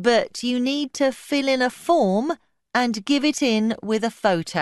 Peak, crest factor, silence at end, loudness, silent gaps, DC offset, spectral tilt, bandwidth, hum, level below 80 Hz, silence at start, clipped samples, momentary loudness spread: -6 dBFS; 16 dB; 0 s; -22 LUFS; none; under 0.1%; -4.5 dB/octave; 12 kHz; none; -62 dBFS; 0 s; under 0.1%; 5 LU